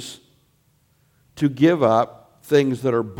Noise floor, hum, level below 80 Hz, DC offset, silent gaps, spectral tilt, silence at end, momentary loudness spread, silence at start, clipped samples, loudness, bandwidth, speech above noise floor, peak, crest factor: -62 dBFS; none; -62 dBFS; under 0.1%; none; -7 dB/octave; 0.05 s; 9 LU; 0 s; under 0.1%; -19 LUFS; 16.5 kHz; 44 dB; -4 dBFS; 18 dB